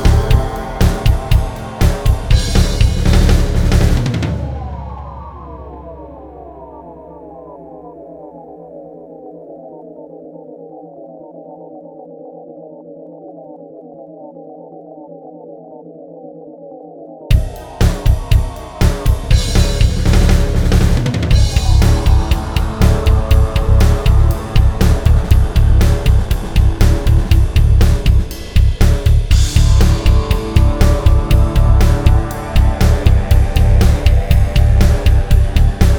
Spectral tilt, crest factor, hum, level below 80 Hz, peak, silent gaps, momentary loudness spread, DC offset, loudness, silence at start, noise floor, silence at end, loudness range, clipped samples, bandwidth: -6 dB/octave; 12 dB; none; -14 dBFS; 0 dBFS; none; 22 LU; under 0.1%; -14 LUFS; 0 s; -34 dBFS; 0 s; 21 LU; under 0.1%; 18.5 kHz